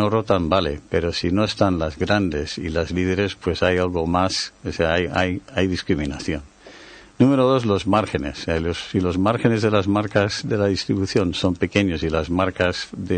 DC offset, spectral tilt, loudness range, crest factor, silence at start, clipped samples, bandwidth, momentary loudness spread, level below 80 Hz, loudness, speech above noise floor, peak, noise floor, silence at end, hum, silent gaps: under 0.1%; -6 dB/octave; 2 LU; 18 dB; 0 s; under 0.1%; 9.4 kHz; 6 LU; -40 dBFS; -21 LUFS; 23 dB; -2 dBFS; -44 dBFS; 0 s; none; none